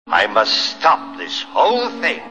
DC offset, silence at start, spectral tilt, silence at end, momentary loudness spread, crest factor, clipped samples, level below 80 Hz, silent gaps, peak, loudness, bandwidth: 0.4%; 0.05 s; -1.5 dB/octave; 0 s; 7 LU; 16 dB; under 0.1%; -60 dBFS; none; 0 dBFS; -17 LUFS; 9.6 kHz